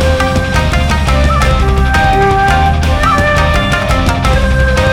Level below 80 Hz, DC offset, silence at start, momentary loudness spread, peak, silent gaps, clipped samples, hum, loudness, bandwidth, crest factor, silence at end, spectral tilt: -14 dBFS; under 0.1%; 0 s; 3 LU; 0 dBFS; none; under 0.1%; none; -11 LUFS; 15.5 kHz; 8 dB; 0 s; -5.5 dB/octave